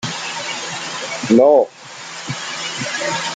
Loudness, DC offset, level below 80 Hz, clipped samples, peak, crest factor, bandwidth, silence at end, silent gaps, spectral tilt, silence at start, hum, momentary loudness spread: -18 LUFS; under 0.1%; -60 dBFS; under 0.1%; -2 dBFS; 18 dB; 9.6 kHz; 0 s; none; -3.5 dB/octave; 0 s; none; 15 LU